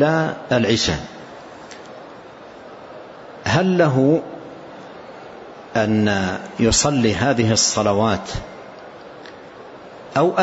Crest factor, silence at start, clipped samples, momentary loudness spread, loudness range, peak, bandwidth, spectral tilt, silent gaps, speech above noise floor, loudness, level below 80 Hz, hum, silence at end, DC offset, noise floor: 16 dB; 0 s; under 0.1%; 23 LU; 6 LU; -4 dBFS; 8.2 kHz; -4.5 dB/octave; none; 22 dB; -18 LUFS; -44 dBFS; none; 0 s; under 0.1%; -39 dBFS